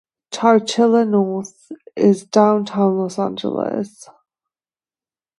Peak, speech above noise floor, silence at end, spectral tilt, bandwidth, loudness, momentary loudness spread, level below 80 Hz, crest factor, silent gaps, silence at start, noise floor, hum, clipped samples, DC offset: 0 dBFS; over 73 dB; 1.55 s; -6 dB/octave; 11.5 kHz; -17 LUFS; 14 LU; -68 dBFS; 18 dB; none; 0.3 s; under -90 dBFS; none; under 0.1%; under 0.1%